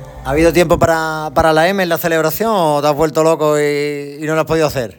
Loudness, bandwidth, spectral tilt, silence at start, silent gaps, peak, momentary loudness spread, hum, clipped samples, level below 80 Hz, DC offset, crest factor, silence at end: -14 LUFS; 19 kHz; -5 dB/octave; 0 s; none; 0 dBFS; 7 LU; none; under 0.1%; -36 dBFS; under 0.1%; 14 dB; 0.05 s